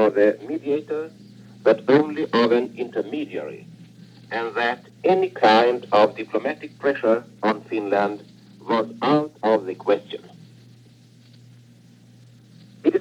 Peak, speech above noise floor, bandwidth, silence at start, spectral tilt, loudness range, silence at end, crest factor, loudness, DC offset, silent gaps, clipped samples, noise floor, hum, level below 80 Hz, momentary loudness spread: -4 dBFS; 29 dB; 10 kHz; 0 s; -6.5 dB/octave; 5 LU; 0 s; 18 dB; -22 LUFS; under 0.1%; none; under 0.1%; -50 dBFS; none; -76 dBFS; 13 LU